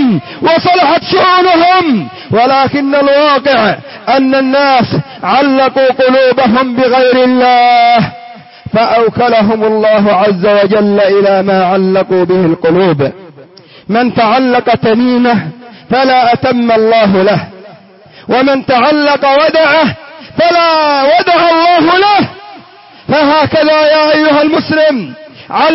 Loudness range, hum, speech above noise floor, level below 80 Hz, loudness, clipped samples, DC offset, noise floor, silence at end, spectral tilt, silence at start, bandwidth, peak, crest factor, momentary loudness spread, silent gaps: 2 LU; none; 29 dB; -48 dBFS; -8 LUFS; under 0.1%; under 0.1%; -37 dBFS; 0 s; -9 dB/octave; 0 s; 5.8 kHz; 0 dBFS; 8 dB; 7 LU; none